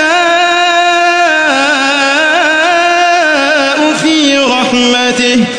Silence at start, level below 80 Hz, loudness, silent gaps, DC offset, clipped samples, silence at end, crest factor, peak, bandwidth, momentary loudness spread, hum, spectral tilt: 0 s; -52 dBFS; -8 LUFS; none; under 0.1%; under 0.1%; 0 s; 8 dB; 0 dBFS; 10.5 kHz; 1 LU; none; -2 dB/octave